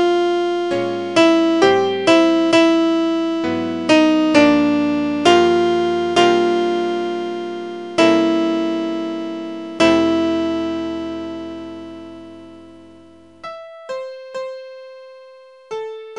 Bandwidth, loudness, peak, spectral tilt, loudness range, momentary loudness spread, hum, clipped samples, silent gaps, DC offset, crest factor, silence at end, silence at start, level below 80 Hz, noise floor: 10.5 kHz; -16 LUFS; 0 dBFS; -4.5 dB/octave; 18 LU; 18 LU; none; under 0.1%; none; 0.2%; 18 dB; 0 s; 0 s; -58 dBFS; -45 dBFS